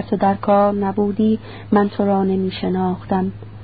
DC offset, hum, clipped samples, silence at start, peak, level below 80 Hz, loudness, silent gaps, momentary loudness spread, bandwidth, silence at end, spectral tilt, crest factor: 0.5%; none; under 0.1%; 0 s; -4 dBFS; -46 dBFS; -19 LUFS; none; 6 LU; 4.9 kHz; 0 s; -12.5 dB/octave; 14 dB